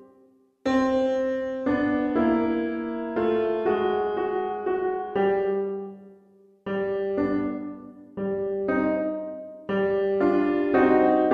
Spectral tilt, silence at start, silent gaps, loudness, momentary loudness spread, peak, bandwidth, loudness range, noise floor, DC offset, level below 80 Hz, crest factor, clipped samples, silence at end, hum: -7.5 dB/octave; 0 s; none; -25 LUFS; 11 LU; -8 dBFS; 6.8 kHz; 4 LU; -59 dBFS; under 0.1%; -56 dBFS; 18 dB; under 0.1%; 0 s; none